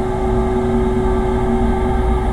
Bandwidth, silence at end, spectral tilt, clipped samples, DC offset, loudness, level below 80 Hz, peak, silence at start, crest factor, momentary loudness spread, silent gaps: 11 kHz; 0 s; -8 dB/octave; under 0.1%; under 0.1%; -18 LUFS; -20 dBFS; -4 dBFS; 0 s; 12 dB; 1 LU; none